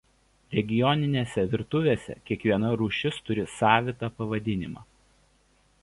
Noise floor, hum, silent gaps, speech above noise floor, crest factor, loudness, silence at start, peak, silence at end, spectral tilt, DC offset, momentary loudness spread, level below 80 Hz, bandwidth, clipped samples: -64 dBFS; none; none; 38 dB; 24 dB; -27 LUFS; 0.5 s; -4 dBFS; 1 s; -6.5 dB/octave; under 0.1%; 10 LU; -54 dBFS; 11.5 kHz; under 0.1%